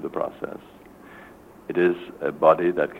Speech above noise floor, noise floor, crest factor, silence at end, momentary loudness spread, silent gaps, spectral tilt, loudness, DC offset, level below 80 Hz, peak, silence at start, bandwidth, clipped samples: 24 dB; -47 dBFS; 20 dB; 0 s; 19 LU; none; -7.5 dB/octave; -23 LUFS; under 0.1%; -60 dBFS; -4 dBFS; 0 s; 4.3 kHz; under 0.1%